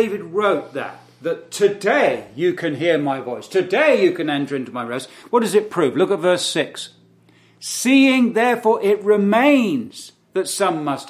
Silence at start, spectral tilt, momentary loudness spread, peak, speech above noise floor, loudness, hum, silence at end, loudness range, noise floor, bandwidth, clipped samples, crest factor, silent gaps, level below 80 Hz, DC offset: 0 s; -4.5 dB/octave; 13 LU; -2 dBFS; 35 dB; -18 LUFS; none; 0 s; 4 LU; -53 dBFS; 15.5 kHz; under 0.1%; 16 dB; none; -70 dBFS; under 0.1%